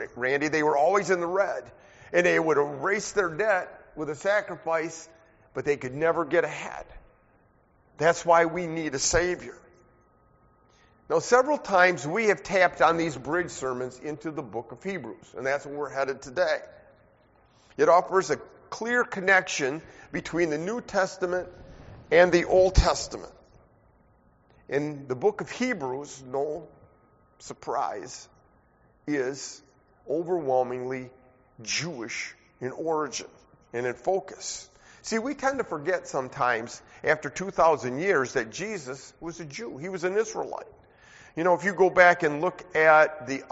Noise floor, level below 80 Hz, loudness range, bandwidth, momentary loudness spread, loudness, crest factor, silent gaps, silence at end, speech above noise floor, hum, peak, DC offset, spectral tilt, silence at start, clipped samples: -63 dBFS; -46 dBFS; 8 LU; 8 kHz; 16 LU; -26 LUFS; 24 dB; none; 0.05 s; 36 dB; none; -4 dBFS; under 0.1%; -3.5 dB/octave; 0 s; under 0.1%